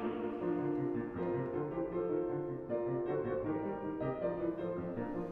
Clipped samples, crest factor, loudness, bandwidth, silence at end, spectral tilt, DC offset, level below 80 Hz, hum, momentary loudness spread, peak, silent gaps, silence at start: under 0.1%; 14 dB; -37 LUFS; 4.1 kHz; 0 s; -10.5 dB/octave; under 0.1%; -62 dBFS; none; 4 LU; -24 dBFS; none; 0 s